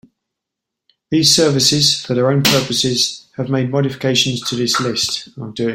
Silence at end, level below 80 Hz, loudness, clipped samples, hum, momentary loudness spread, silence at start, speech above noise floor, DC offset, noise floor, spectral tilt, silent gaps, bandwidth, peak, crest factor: 0 s; -52 dBFS; -15 LUFS; under 0.1%; none; 9 LU; 1.1 s; 65 dB; under 0.1%; -81 dBFS; -3.5 dB/octave; none; 16.5 kHz; 0 dBFS; 18 dB